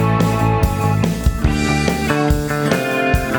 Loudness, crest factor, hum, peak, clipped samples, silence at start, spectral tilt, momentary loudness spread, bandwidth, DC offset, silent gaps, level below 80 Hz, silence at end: -17 LUFS; 14 dB; none; -2 dBFS; under 0.1%; 0 s; -6 dB/octave; 2 LU; over 20 kHz; under 0.1%; none; -24 dBFS; 0 s